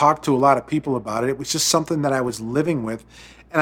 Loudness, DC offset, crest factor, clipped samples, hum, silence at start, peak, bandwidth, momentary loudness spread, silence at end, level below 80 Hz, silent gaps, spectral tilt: -21 LUFS; under 0.1%; 20 dB; under 0.1%; none; 0 s; -2 dBFS; 17.5 kHz; 8 LU; 0 s; -54 dBFS; none; -4 dB/octave